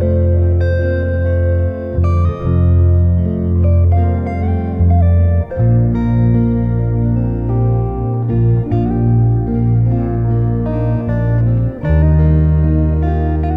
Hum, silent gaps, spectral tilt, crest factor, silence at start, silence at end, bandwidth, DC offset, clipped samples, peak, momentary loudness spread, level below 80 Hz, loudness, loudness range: none; none; -12 dB/octave; 10 dB; 0 s; 0 s; 3.9 kHz; under 0.1%; under 0.1%; -2 dBFS; 5 LU; -20 dBFS; -14 LUFS; 1 LU